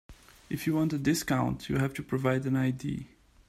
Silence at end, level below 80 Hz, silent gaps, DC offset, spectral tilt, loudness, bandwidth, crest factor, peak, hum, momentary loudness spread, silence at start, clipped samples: 0.45 s; -54 dBFS; none; under 0.1%; -6 dB/octave; -30 LUFS; 15.5 kHz; 16 dB; -14 dBFS; none; 8 LU; 0.1 s; under 0.1%